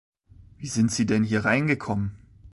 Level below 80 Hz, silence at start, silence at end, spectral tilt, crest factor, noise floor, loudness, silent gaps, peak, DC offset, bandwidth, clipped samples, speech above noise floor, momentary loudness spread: -50 dBFS; 0.6 s; 0.05 s; -5.5 dB/octave; 18 dB; -51 dBFS; -24 LUFS; none; -8 dBFS; under 0.1%; 11.5 kHz; under 0.1%; 28 dB; 10 LU